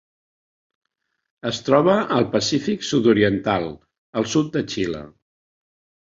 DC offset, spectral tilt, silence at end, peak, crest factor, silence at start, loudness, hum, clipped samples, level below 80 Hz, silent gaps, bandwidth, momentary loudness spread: under 0.1%; -5 dB/octave; 1.05 s; -2 dBFS; 20 dB; 1.45 s; -20 LUFS; none; under 0.1%; -54 dBFS; 3.98-4.13 s; 7.8 kHz; 12 LU